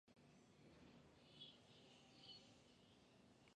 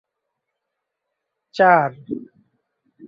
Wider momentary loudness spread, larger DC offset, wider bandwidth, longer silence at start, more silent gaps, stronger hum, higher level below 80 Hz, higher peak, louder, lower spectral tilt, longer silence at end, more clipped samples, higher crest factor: second, 7 LU vs 18 LU; neither; first, 9.6 kHz vs 7.4 kHz; second, 0.05 s vs 1.55 s; neither; neither; second, -86 dBFS vs -68 dBFS; second, -50 dBFS vs -2 dBFS; second, -65 LUFS vs -16 LUFS; second, -4 dB/octave vs -7 dB/octave; second, 0 s vs 0.85 s; neither; about the same, 20 dB vs 20 dB